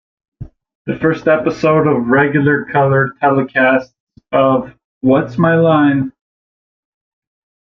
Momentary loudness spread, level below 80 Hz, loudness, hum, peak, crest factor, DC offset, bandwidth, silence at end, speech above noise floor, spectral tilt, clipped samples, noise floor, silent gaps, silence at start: 7 LU; -50 dBFS; -13 LUFS; none; 0 dBFS; 14 dB; under 0.1%; 6.4 kHz; 1.55 s; over 77 dB; -8.5 dB/octave; under 0.1%; under -90 dBFS; 0.75-0.85 s, 4.00-4.07 s, 4.84-5.01 s; 0.4 s